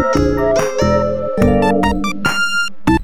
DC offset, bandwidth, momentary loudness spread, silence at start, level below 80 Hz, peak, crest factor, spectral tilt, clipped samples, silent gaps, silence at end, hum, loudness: 5%; 16.5 kHz; 4 LU; 0 s; -28 dBFS; 0 dBFS; 14 dB; -5.5 dB/octave; under 0.1%; none; 0 s; none; -15 LUFS